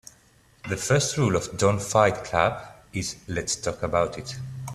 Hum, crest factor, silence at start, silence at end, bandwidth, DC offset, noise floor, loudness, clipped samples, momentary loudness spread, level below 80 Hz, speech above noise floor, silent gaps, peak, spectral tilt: none; 22 dB; 0.65 s; 0 s; 14.5 kHz; under 0.1%; -58 dBFS; -25 LUFS; under 0.1%; 14 LU; -50 dBFS; 34 dB; none; -4 dBFS; -4.5 dB/octave